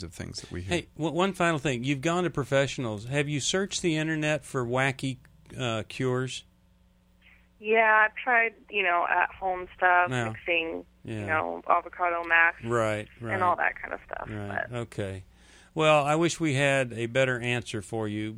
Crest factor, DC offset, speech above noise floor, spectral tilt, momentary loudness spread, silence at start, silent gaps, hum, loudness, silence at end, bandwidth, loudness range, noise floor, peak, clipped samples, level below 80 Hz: 20 dB; under 0.1%; 34 dB; -4.5 dB/octave; 14 LU; 0 s; none; none; -27 LUFS; 0 s; 15 kHz; 5 LU; -62 dBFS; -8 dBFS; under 0.1%; -56 dBFS